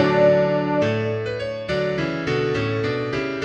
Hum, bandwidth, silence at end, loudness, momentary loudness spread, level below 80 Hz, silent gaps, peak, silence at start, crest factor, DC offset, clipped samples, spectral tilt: none; 8.4 kHz; 0 s; -22 LUFS; 9 LU; -48 dBFS; none; -6 dBFS; 0 s; 16 dB; under 0.1%; under 0.1%; -7 dB/octave